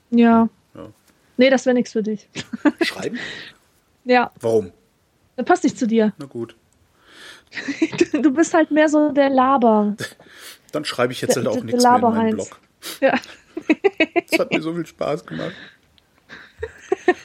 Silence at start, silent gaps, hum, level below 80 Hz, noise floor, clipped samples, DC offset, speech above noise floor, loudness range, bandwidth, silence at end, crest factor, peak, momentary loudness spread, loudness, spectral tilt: 0.1 s; none; none; -60 dBFS; -61 dBFS; under 0.1%; under 0.1%; 43 dB; 5 LU; 16 kHz; 0.05 s; 18 dB; -2 dBFS; 19 LU; -19 LUFS; -5 dB/octave